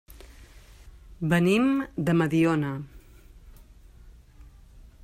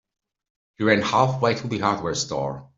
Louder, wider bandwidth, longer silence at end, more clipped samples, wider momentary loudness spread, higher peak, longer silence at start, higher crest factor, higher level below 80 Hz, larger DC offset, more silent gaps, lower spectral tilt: second, -25 LUFS vs -22 LUFS; first, 14.5 kHz vs 7.8 kHz; about the same, 0.25 s vs 0.15 s; neither; first, 12 LU vs 7 LU; second, -10 dBFS vs -4 dBFS; second, 0.15 s vs 0.8 s; about the same, 18 dB vs 20 dB; first, -50 dBFS vs -58 dBFS; neither; neither; first, -7 dB/octave vs -5 dB/octave